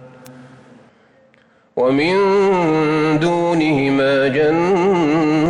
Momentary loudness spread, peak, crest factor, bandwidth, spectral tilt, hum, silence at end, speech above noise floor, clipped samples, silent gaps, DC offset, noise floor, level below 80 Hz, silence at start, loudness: 2 LU; -6 dBFS; 10 dB; 10.5 kHz; -6.5 dB/octave; none; 0 s; 39 dB; under 0.1%; none; under 0.1%; -54 dBFS; -52 dBFS; 0 s; -15 LUFS